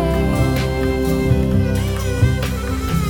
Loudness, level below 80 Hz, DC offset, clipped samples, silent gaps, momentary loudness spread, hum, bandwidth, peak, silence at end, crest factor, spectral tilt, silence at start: -18 LUFS; -24 dBFS; under 0.1%; under 0.1%; none; 4 LU; none; 18 kHz; -4 dBFS; 0 s; 14 dB; -6.5 dB/octave; 0 s